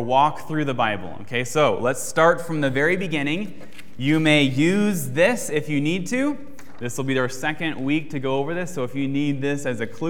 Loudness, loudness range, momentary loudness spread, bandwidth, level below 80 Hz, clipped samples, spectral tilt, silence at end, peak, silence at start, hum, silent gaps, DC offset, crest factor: -22 LUFS; 4 LU; 10 LU; 17 kHz; -60 dBFS; under 0.1%; -5 dB/octave; 0 s; -2 dBFS; 0 s; none; none; 3%; 20 dB